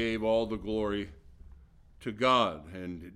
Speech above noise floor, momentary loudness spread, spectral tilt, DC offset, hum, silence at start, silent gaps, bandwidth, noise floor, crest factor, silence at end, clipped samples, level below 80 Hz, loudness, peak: 24 dB; 16 LU; -5.5 dB/octave; under 0.1%; none; 0 s; none; 12.5 kHz; -55 dBFS; 20 dB; 0 s; under 0.1%; -52 dBFS; -30 LUFS; -12 dBFS